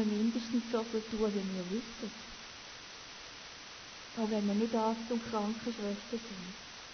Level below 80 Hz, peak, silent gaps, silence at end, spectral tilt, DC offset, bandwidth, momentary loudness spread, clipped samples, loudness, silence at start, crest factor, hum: -64 dBFS; -20 dBFS; none; 0 s; -5 dB/octave; under 0.1%; 6.6 kHz; 14 LU; under 0.1%; -37 LUFS; 0 s; 16 dB; none